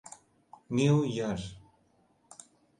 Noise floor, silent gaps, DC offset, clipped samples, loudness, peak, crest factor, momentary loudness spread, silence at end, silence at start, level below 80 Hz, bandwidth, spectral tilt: -68 dBFS; none; under 0.1%; under 0.1%; -29 LUFS; -14 dBFS; 20 dB; 26 LU; 1.2 s; 0.7 s; -60 dBFS; 11.5 kHz; -6.5 dB/octave